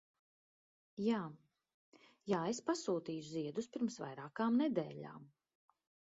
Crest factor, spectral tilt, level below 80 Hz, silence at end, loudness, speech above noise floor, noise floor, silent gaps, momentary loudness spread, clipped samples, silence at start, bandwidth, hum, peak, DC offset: 20 dB; -5.5 dB/octave; -82 dBFS; 0.85 s; -40 LUFS; over 51 dB; under -90 dBFS; 1.74-1.92 s; 16 LU; under 0.1%; 0.95 s; 7.6 kHz; none; -22 dBFS; under 0.1%